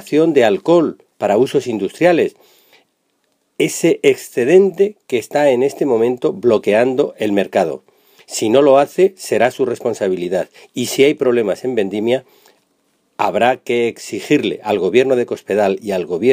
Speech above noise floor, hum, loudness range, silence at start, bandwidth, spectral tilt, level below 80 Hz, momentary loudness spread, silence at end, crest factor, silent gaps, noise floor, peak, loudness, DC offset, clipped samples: 50 dB; none; 3 LU; 0.05 s; 15.5 kHz; -5 dB/octave; -64 dBFS; 9 LU; 0 s; 16 dB; none; -65 dBFS; 0 dBFS; -16 LUFS; under 0.1%; under 0.1%